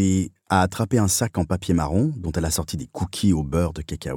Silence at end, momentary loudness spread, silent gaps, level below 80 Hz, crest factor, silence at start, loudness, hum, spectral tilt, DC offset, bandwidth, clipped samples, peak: 0 s; 7 LU; none; -38 dBFS; 20 dB; 0 s; -23 LUFS; none; -5.5 dB/octave; under 0.1%; 19 kHz; under 0.1%; -4 dBFS